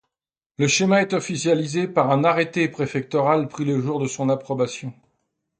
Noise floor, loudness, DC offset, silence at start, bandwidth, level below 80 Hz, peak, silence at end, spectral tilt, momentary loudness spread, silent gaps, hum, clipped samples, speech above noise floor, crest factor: -89 dBFS; -21 LUFS; under 0.1%; 0.6 s; 9.4 kHz; -64 dBFS; -4 dBFS; 0.7 s; -5 dB/octave; 7 LU; none; none; under 0.1%; 68 dB; 18 dB